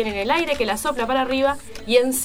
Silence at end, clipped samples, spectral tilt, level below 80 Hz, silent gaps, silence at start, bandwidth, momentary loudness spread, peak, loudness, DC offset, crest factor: 0 s; under 0.1%; -2.5 dB/octave; -44 dBFS; none; 0 s; 16.5 kHz; 4 LU; -4 dBFS; -21 LUFS; under 0.1%; 16 dB